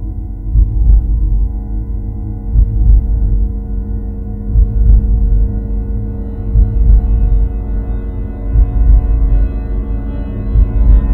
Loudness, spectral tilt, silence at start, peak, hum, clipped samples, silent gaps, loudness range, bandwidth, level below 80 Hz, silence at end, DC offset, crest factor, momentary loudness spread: -16 LUFS; -12.5 dB/octave; 0 s; 0 dBFS; none; 0.3%; none; 2 LU; 2.1 kHz; -12 dBFS; 0 s; under 0.1%; 12 dB; 10 LU